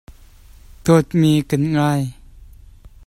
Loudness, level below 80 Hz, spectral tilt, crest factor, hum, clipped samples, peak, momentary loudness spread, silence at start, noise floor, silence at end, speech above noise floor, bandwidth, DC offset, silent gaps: -17 LUFS; -44 dBFS; -7 dB/octave; 18 dB; none; under 0.1%; -2 dBFS; 9 LU; 0.85 s; -44 dBFS; 0.65 s; 28 dB; 15 kHz; under 0.1%; none